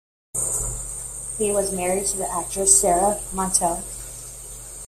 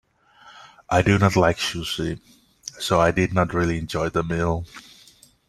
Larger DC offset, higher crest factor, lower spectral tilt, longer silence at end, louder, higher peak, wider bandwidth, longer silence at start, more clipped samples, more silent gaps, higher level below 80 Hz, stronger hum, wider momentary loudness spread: neither; about the same, 22 dB vs 20 dB; second, -3 dB/octave vs -5.5 dB/octave; second, 0 s vs 0.7 s; about the same, -21 LUFS vs -22 LUFS; about the same, -2 dBFS vs -4 dBFS; first, 16 kHz vs 14 kHz; about the same, 0.35 s vs 0.45 s; neither; neither; about the same, -42 dBFS vs -44 dBFS; neither; about the same, 19 LU vs 19 LU